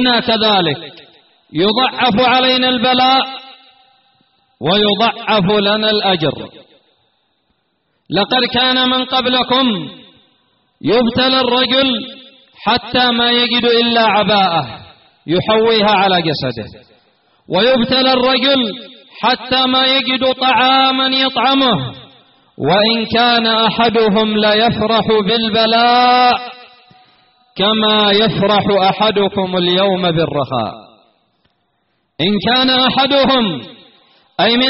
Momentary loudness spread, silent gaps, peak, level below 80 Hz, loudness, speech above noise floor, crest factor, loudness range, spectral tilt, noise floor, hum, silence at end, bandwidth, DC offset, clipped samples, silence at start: 10 LU; none; -2 dBFS; -48 dBFS; -12 LUFS; 51 dB; 12 dB; 4 LU; -2 dB/octave; -64 dBFS; none; 0 s; 5.8 kHz; under 0.1%; under 0.1%; 0 s